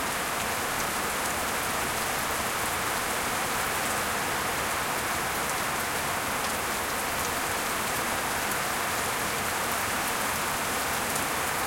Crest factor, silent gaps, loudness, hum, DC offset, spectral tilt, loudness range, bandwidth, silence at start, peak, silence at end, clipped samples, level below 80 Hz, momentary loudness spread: 16 dB; none; -27 LUFS; none; under 0.1%; -1.5 dB/octave; 0 LU; 17 kHz; 0 s; -14 dBFS; 0 s; under 0.1%; -52 dBFS; 1 LU